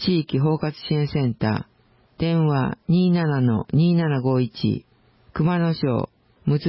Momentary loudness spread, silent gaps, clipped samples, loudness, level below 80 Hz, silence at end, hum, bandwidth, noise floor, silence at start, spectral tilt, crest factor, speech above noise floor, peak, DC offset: 8 LU; none; under 0.1%; -22 LUFS; -50 dBFS; 0 s; none; 5.8 kHz; -51 dBFS; 0 s; -12 dB/octave; 12 dB; 31 dB; -10 dBFS; under 0.1%